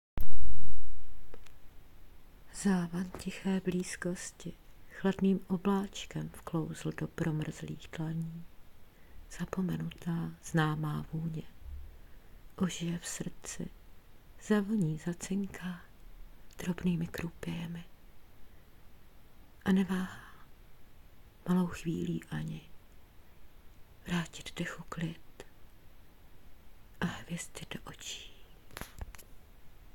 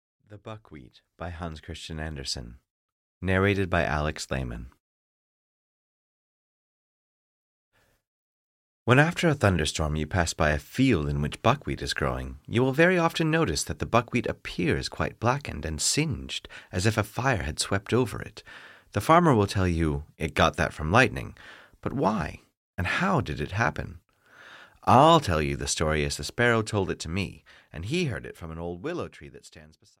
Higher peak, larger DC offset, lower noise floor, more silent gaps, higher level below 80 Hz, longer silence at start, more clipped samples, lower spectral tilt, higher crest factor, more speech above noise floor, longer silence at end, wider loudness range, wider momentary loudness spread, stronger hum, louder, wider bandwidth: about the same, -8 dBFS vs -6 dBFS; neither; about the same, -54 dBFS vs -54 dBFS; second, none vs 2.71-3.21 s, 4.80-7.71 s, 8.07-8.86 s, 22.57-22.73 s; second, -52 dBFS vs -44 dBFS; second, 0.15 s vs 0.3 s; neither; about the same, -6 dB/octave vs -5 dB/octave; about the same, 20 dB vs 22 dB; second, 20 dB vs 28 dB; second, 0 s vs 0.35 s; about the same, 8 LU vs 7 LU; first, 20 LU vs 17 LU; neither; second, -36 LUFS vs -26 LUFS; about the same, 17 kHz vs 16.5 kHz